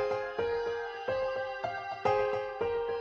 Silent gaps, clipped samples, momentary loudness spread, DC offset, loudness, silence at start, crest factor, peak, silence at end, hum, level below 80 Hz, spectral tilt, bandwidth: none; under 0.1%; 6 LU; under 0.1%; -33 LUFS; 0 s; 18 dB; -16 dBFS; 0 s; none; -60 dBFS; -5 dB/octave; 7 kHz